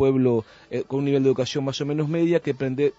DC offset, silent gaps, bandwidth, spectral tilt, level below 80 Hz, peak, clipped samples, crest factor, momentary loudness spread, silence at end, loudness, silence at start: under 0.1%; none; 8 kHz; -7 dB/octave; -62 dBFS; -8 dBFS; under 0.1%; 14 dB; 7 LU; 0.05 s; -23 LUFS; 0 s